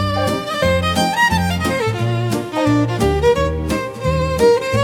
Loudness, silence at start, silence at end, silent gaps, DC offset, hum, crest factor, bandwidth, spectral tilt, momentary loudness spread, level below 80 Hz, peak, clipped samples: -17 LUFS; 0 s; 0 s; none; under 0.1%; none; 14 dB; 17.5 kHz; -5.5 dB/octave; 6 LU; -32 dBFS; -2 dBFS; under 0.1%